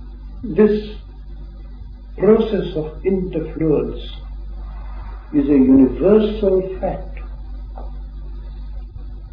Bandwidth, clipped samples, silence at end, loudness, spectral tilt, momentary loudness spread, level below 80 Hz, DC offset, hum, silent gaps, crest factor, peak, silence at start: 5.2 kHz; under 0.1%; 0.05 s; -17 LUFS; -10.5 dB/octave; 23 LU; -30 dBFS; under 0.1%; none; none; 18 dB; 0 dBFS; 0 s